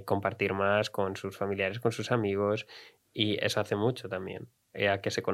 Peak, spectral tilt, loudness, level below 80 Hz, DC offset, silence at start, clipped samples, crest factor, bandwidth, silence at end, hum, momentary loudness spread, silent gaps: -12 dBFS; -5 dB/octave; -30 LUFS; -72 dBFS; under 0.1%; 0 s; under 0.1%; 18 dB; 15.5 kHz; 0 s; none; 14 LU; none